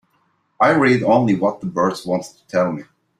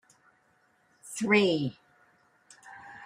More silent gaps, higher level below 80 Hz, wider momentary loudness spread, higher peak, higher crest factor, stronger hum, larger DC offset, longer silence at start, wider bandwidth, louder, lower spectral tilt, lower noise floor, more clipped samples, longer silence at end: neither; first, -58 dBFS vs -76 dBFS; second, 10 LU vs 25 LU; first, -2 dBFS vs -10 dBFS; about the same, 18 dB vs 22 dB; neither; neither; second, 0.6 s vs 1.05 s; second, 13 kHz vs 15 kHz; first, -18 LUFS vs -27 LUFS; first, -6.5 dB/octave vs -4.5 dB/octave; second, -64 dBFS vs -68 dBFS; neither; first, 0.35 s vs 0 s